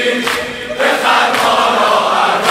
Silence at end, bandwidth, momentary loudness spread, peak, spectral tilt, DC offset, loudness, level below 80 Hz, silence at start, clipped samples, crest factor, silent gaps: 0 s; 16 kHz; 6 LU; 0 dBFS; -2 dB/octave; under 0.1%; -12 LUFS; -50 dBFS; 0 s; under 0.1%; 12 dB; none